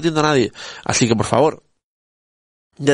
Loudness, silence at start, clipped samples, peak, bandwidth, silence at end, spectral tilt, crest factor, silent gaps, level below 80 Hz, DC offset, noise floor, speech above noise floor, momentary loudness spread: -18 LUFS; 0 s; under 0.1%; 0 dBFS; 10.5 kHz; 0 s; -4.5 dB/octave; 18 dB; 1.83-2.70 s; -48 dBFS; under 0.1%; under -90 dBFS; over 73 dB; 7 LU